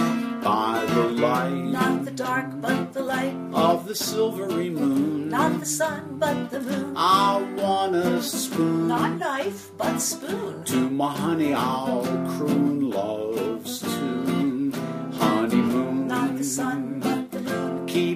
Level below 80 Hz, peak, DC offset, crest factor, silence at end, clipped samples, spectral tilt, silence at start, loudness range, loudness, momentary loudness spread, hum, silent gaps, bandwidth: -66 dBFS; -6 dBFS; under 0.1%; 18 dB; 0 s; under 0.1%; -4.5 dB/octave; 0 s; 2 LU; -24 LUFS; 6 LU; none; none; 15.5 kHz